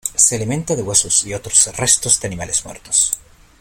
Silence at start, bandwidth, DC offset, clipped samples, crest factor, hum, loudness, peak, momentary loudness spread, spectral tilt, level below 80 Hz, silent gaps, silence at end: 0.05 s; over 20 kHz; under 0.1%; under 0.1%; 18 dB; none; -15 LUFS; 0 dBFS; 8 LU; -2 dB/octave; -44 dBFS; none; 0.4 s